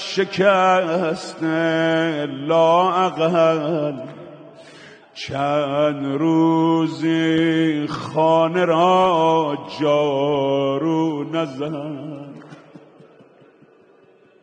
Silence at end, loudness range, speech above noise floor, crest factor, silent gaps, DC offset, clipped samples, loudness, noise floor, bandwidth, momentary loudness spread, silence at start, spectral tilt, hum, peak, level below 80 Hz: 1.85 s; 6 LU; 34 dB; 16 dB; none; under 0.1%; under 0.1%; -19 LUFS; -52 dBFS; 9.2 kHz; 12 LU; 0 s; -6.5 dB/octave; none; -4 dBFS; -64 dBFS